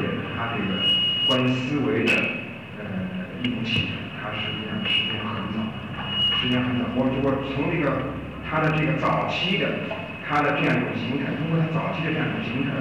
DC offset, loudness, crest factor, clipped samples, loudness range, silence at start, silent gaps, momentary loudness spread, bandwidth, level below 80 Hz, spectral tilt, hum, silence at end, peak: 0.2%; -24 LUFS; 14 dB; under 0.1%; 3 LU; 0 s; none; 11 LU; 11.5 kHz; -50 dBFS; -6 dB/octave; none; 0 s; -12 dBFS